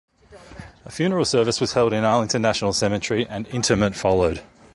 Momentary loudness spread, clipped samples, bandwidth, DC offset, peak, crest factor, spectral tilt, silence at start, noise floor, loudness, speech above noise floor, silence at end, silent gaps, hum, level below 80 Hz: 8 LU; under 0.1%; 11.5 kHz; under 0.1%; -4 dBFS; 18 dB; -4.5 dB/octave; 0.3 s; -45 dBFS; -21 LUFS; 25 dB; 0.3 s; none; none; -44 dBFS